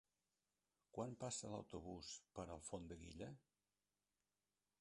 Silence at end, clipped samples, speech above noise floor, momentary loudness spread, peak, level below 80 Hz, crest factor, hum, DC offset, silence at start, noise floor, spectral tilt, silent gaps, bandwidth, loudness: 1.4 s; under 0.1%; over 37 dB; 8 LU; -34 dBFS; -72 dBFS; 22 dB; 50 Hz at -80 dBFS; under 0.1%; 0.95 s; under -90 dBFS; -4.5 dB/octave; none; 11 kHz; -53 LUFS